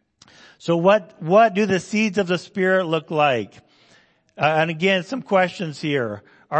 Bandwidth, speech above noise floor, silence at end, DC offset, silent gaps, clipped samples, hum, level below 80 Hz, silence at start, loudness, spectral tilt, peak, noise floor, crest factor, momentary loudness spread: 8.6 kHz; 37 dB; 0 s; under 0.1%; none; under 0.1%; none; -66 dBFS; 0.65 s; -20 LUFS; -5.5 dB/octave; -2 dBFS; -57 dBFS; 18 dB; 9 LU